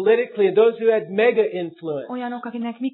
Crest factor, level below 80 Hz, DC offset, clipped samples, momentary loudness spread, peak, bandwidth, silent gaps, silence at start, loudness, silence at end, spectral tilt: 16 dB; -84 dBFS; under 0.1%; under 0.1%; 12 LU; -4 dBFS; 4.1 kHz; none; 0 s; -21 LUFS; 0.05 s; -9.5 dB/octave